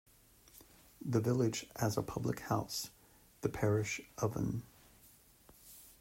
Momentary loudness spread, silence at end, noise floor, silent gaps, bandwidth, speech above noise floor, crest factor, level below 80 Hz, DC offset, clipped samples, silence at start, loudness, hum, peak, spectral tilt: 21 LU; 0.1 s; -64 dBFS; none; 16 kHz; 28 dB; 20 dB; -62 dBFS; under 0.1%; under 0.1%; 0.55 s; -37 LUFS; none; -18 dBFS; -5.5 dB/octave